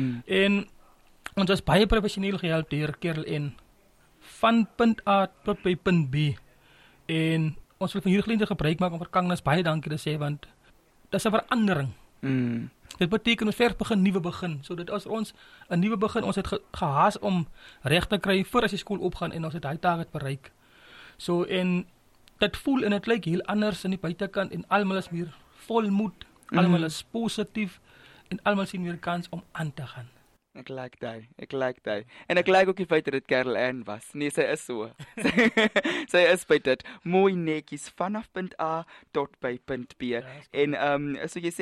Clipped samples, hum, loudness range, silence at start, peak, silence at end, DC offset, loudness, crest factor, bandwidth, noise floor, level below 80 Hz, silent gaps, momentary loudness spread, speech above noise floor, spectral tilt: under 0.1%; none; 6 LU; 0 s; -8 dBFS; 0 s; under 0.1%; -27 LUFS; 18 dB; 13.5 kHz; -60 dBFS; -50 dBFS; none; 13 LU; 33 dB; -6 dB/octave